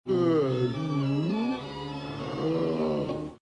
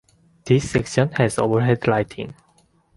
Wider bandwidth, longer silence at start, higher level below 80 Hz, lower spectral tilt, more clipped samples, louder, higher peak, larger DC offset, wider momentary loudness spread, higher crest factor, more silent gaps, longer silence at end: about the same, 10.5 kHz vs 11.5 kHz; second, 0.05 s vs 0.45 s; second, -58 dBFS vs -48 dBFS; first, -8 dB/octave vs -6.5 dB/octave; neither; second, -29 LUFS vs -20 LUFS; second, -14 dBFS vs -4 dBFS; neither; about the same, 11 LU vs 11 LU; about the same, 14 dB vs 18 dB; neither; second, 0.05 s vs 0.65 s